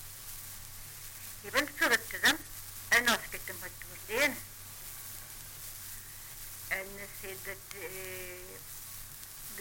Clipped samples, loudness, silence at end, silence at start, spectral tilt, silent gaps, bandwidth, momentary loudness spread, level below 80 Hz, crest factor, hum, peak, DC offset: under 0.1%; -34 LUFS; 0 s; 0 s; -1.5 dB/octave; none; 17 kHz; 16 LU; -56 dBFS; 22 dB; none; -14 dBFS; under 0.1%